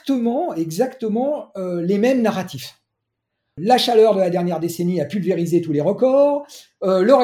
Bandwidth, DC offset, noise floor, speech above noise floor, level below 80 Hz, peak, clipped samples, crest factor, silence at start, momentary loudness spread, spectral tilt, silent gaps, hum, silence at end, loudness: 16.5 kHz; under 0.1%; -78 dBFS; 60 dB; -66 dBFS; -2 dBFS; under 0.1%; 18 dB; 0.05 s; 12 LU; -6 dB/octave; none; none; 0 s; -19 LUFS